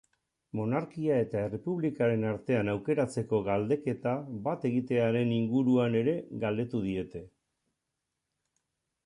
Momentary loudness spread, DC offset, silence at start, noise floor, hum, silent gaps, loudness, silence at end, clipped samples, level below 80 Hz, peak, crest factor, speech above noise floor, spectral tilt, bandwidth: 7 LU; under 0.1%; 0.55 s; -85 dBFS; none; none; -30 LUFS; 1.8 s; under 0.1%; -62 dBFS; -14 dBFS; 16 dB; 55 dB; -8 dB/octave; 11 kHz